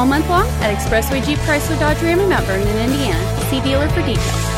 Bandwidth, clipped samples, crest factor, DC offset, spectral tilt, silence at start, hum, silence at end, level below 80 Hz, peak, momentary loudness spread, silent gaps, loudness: 16.5 kHz; under 0.1%; 12 dB; under 0.1%; -5 dB/octave; 0 s; none; 0 s; -24 dBFS; -4 dBFS; 3 LU; none; -17 LUFS